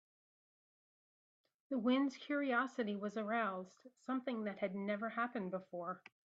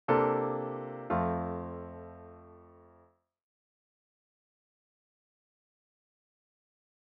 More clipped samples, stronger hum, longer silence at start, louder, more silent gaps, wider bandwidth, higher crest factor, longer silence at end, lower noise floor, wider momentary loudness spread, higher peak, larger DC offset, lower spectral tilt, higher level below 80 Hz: neither; neither; first, 1.7 s vs 0.1 s; second, -40 LUFS vs -33 LUFS; neither; first, 7.8 kHz vs 5.2 kHz; second, 18 dB vs 24 dB; second, 0.25 s vs 4.25 s; first, under -90 dBFS vs -66 dBFS; second, 10 LU vs 23 LU; second, -24 dBFS vs -12 dBFS; neither; about the same, -6.5 dB/octave vs -7 dB/octave; second, -90 dBFS vs -62 dBFS